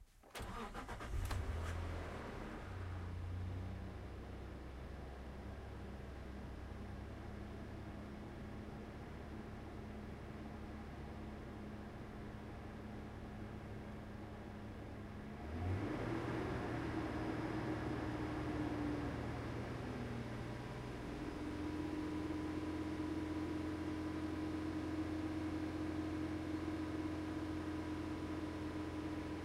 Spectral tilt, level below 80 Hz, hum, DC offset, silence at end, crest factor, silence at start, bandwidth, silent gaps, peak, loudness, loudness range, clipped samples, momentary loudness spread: -7 dB/octave; -54 dBFS; none; under 0.1%; 0 s; 16 dB; 0 s; 15.5 kHz; none; -30 dBFS; -46 LUFS; 8 LU; under 0.1%; 9 LU